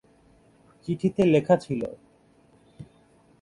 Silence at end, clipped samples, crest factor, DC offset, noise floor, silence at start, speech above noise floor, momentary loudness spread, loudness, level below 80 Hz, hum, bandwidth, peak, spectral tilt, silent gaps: 0.6 s; under 0.1%; 22 dB; under 0.1%; -59 dBFS; 0.85 s; 36 dB; 15 LU; -24 LUFS; -60 dBFS; none; 11 kHz; -6 dBFS; -8 dB/octave; none